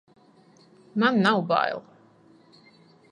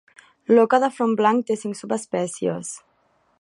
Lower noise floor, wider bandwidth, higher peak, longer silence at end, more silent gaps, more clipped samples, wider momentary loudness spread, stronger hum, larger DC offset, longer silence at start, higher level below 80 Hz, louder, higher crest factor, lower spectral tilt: second, -56 dBFS vs -64 dBFS; second, 10 kHz vs 11.5 kHz; about the same, -6 dBFS vs -4 dBFS; first, 1.3 s vs 0.65 s; neither; neither; second, 13 LU vs 16 LU; neither; neither; first, 0.95 s vs 0.5 s; about the same, -76 dBFS vs -74 dBFS; about the same, -23 LUFS vs -21 LUFS; about the same, 22 dB vs 18 dB; first, -6.5 dB/octave vs -5 dB/octave